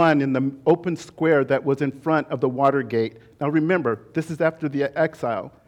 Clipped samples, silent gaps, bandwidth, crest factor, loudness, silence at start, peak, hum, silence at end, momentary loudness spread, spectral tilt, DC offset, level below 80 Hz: under 0.1%; none; 11.5 kHz; 16 dB; -22 LUFS; 0 s; -6 dBFS; none; 0.2 s; 8 LU; -7.5 dB/octave; under 0.1%; -64 dBFS